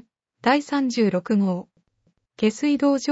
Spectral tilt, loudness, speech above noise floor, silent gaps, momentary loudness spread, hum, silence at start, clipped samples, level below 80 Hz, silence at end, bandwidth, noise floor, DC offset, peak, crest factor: -5.5 dB/octave; -22 LUFS; 48 dB; none; 5 LU; none; 0.45 s; under 0.1%; -66 dBFS; 0 s; 8 kHz; -69 dBFS; under 0.1%; -6 dBFS; 16 dB